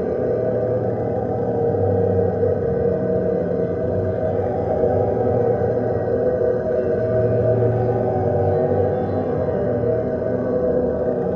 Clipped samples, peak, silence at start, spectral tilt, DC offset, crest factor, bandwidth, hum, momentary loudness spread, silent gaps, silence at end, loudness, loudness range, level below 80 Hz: under 0.1%; -6 dBFS; 0 s; -11 dB/octave; under 0.1%; 14 dB; 5.4 kHz; none; 3 LU; none; 0 s; -20 LUFS; 1 LU; -42 dBFS